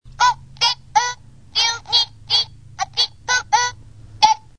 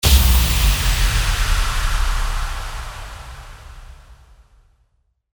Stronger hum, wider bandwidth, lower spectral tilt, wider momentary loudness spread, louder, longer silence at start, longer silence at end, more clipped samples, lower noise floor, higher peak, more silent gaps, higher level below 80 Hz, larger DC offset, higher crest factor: neither; second, 10.5 kHz vs over 20 kHz; second, 1 dB/octave vs -3 dB/octave; second, 8 LU vs 23 LU; about the same, -18 LUFS vs -19 LUFS; about the same, 0.05 s vs 0.05 s; second, 0.2 s vs 1.2 s; neither; second, -41 dBFS vs -65 dBFS; about the same, 0 dBFS vs -2 dBFS; neither; second, -48 dBFS vs -20 dBFS; first, 0.4% vs under 0.1%; about the same, 20 dB vs 18 dB